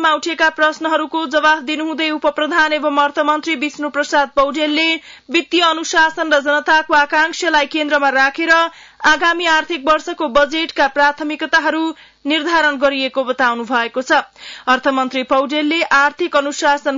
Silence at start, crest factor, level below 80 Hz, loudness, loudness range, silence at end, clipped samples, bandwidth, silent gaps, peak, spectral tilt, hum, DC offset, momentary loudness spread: 0 s; 12 dB; -50 dBFS; -15 LUFS; 2 LU; 0 s; under 0.1%; 7.8 kHz; none; -2 dBFS; -1.5 dB/octave; none; under 0.1%; 6 LU